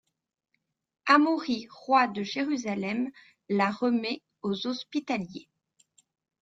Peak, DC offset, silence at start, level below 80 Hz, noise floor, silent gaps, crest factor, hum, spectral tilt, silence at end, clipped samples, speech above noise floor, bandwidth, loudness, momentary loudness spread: -8 dBFS; under 0.1%; 1.05 s; -74 dBFS; -67 dBFS; none; 22 dB; none; -5 dB/octave; 1 s; under 0.1%; 39 dB; 7.8 kHz; -28 LUFS; 12 LU